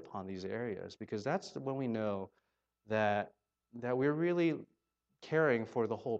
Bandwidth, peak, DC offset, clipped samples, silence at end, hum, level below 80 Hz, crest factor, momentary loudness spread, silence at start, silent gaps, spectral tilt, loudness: 8.2 kHz; -18 dBFS; under 0.1%; under 0.1%; 0 s; none; -80 dBFS; 18 dB; 12 LU; 0 s; none; -7 dB/octave; -36 LUFS